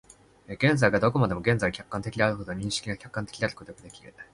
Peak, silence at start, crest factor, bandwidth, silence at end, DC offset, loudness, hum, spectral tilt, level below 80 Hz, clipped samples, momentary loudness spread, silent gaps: -6 dBFS; 0.5 s; 22 dB; 11.5 kHz; 0.1 s; under 0.1%; -27 LUFS; none; -5.5 dB/octave; -52 dBFS; under 0.1%; 21 LU; none